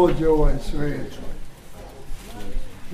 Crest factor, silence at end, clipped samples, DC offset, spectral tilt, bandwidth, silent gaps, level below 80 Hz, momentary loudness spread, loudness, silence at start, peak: 16 dB; 0 s; under 0.1%; under 0.1%; -7 dB/octave; 12.5 kHz; none; -26 dBFS; 22 LU; -24 LUFS; 0 s; -6 dBFS